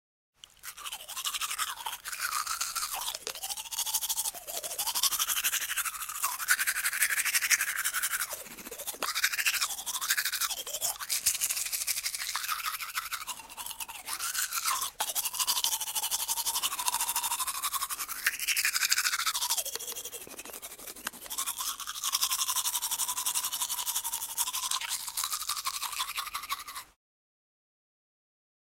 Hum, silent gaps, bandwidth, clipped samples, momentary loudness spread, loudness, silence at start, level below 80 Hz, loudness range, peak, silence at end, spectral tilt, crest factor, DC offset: none; none; 17 kHz; under 0.1%; 11 LU; -30 LUFS; 0.65 s; -68 dBFS; 5 LU; -4 dBFS; 1.75 s; 3 dB/octave; 30 dB; under 0.1%